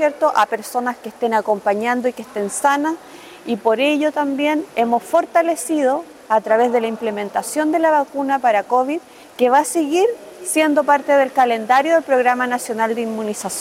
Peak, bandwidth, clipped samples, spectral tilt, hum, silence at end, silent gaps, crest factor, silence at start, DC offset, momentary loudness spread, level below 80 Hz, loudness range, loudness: -2 dBFS; 16.5 kHz; under 0.1%; -3.5 dB/octave; none; 0 s; none; 14 dB; 0 s; under 0.1%; 9 LU; -68 dBFS; 3 LU; -18 LUFS